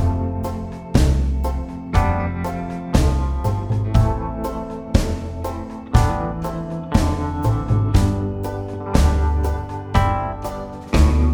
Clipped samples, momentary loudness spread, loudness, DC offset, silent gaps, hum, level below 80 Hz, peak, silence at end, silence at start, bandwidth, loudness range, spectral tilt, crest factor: under 0.1%; 10 LU; -21 LUFS; under 0.1%; none; none; -22 dBFS; 0 dBFS; 0 s; 0 s; 16.5 kHz; 2 LU; -7 dB/octave; 18 dB